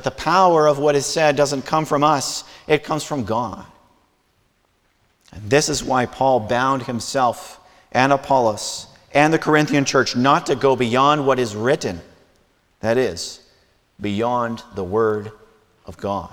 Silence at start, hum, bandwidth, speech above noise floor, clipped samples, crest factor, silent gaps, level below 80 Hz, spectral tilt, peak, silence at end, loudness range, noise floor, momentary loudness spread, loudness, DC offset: 0 s; none; 19 kHz; 45 dB; under 0.1%; 18 dB; none; -52 dBFS; -4.5 dB/octave; -2 dBFS; 0.05 s; 7 LU; -63 dBFS; 13 LU; -19 LUFS; under 0.1%